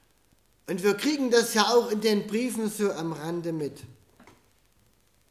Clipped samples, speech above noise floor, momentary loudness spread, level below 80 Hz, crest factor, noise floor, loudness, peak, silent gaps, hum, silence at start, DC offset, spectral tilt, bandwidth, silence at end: under 0.1%; 39 dB; 13 LU; -68 dBFS; 20 dB; -65 dBFS; -26 LUFS; -8 dBFS; none; none; 0.7 s; under 0.1%; -4 dB/octave; 15.5 kHz; 1.4 s